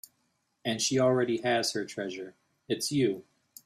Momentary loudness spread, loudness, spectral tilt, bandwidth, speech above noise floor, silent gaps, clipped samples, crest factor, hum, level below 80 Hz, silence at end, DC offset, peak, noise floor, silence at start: 13 LU; -29 LUFS; -4 dB/octave; 15 kHz; 47 dB; none; under 0.1%; 16 dB; none; -72 dBFS; 0.45 s; under 0.1%; -14 dBFS; -75 dBFS; 0.65 s